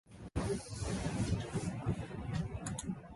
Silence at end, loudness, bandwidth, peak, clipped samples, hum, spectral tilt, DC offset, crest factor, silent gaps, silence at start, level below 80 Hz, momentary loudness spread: 0 s; -39 LUFS; 11.5 kHz; -22 dBFS; under 0.1%; none; -6 dB/octave; under 0.1%; 16 dB; none; 0.1 s; -48 dBFS; 4 LU